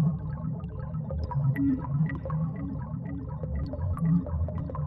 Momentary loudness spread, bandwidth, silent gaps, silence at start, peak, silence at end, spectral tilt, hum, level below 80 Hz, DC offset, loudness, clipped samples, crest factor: 9 LU; 5.4 kHz; none; 0 s; -16 dBFS; 0 s; -11.5 dB/octave; none; -42 dBFS; under 0.1%; -31 LUFS; under 0.1%; 14 dB